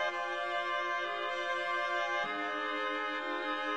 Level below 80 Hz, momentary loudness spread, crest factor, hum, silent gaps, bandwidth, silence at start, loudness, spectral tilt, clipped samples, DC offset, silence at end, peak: -78 dBFS; 3 LU; 14 dB; none; none; 11.5 kHz; 0 s; -34 LUFS; -2 dB/octave; under 0.1%; 0.1%; 0 s; -20 dBFS